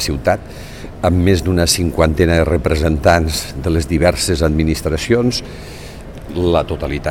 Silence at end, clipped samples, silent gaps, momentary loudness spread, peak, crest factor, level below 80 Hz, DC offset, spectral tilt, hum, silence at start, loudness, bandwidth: 0 s; under 0.1%; none; 18 LU; 0 dBFS; 16 dB; -26 dBFS; 0.4%; -5 dB/octave; none; 0 s; -16 LUFS; 17 kHz